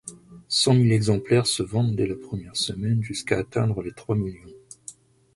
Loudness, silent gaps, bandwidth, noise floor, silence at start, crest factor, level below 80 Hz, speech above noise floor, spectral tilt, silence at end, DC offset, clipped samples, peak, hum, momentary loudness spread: -24 LUFS; none; 11.5 kHz; -47 dBFS; 0.05 s; 20 dB; -50 dBFS; 24 dB; -5 dB/octave; 0.45 s; under 0.1%; under 0.1%; -4 dBFS; none; 18 LU